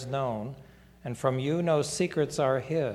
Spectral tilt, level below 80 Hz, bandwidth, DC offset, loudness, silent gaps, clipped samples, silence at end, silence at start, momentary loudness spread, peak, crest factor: -5.5 dB/octave; -60 dBFS; 15 kHz; under 0.1%; -29 LUFS; none; under 0.1%; 0 s; 0 s; 14 LU; -12 dBFS; 18 dB